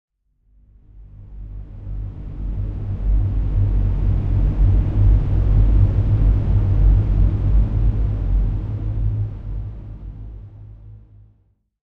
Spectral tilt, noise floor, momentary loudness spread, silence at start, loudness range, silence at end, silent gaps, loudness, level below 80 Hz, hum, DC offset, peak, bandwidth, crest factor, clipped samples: -11 dB/octave; -60 dBFS; 19 LU; 0.95 s; 10 LU; 0.9 s; none; -20 LUFS; -20 dBFS; none; under 0.1%; -4 dBFS; 3 kHz; 14 dB; under 0.1%